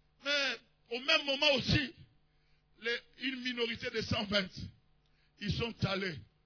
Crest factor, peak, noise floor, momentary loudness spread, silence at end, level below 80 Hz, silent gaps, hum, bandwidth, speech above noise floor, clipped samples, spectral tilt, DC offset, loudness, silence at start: 22 dB; -14 dBFS; -70 dBFS; 14 LU; 0.2 s; -58 dBFS; none; none; 5.4 kHz; 36 dB; under 0.1%; -4.5 dB/octave; under 0.1%; -33 LUFS; 0.25 s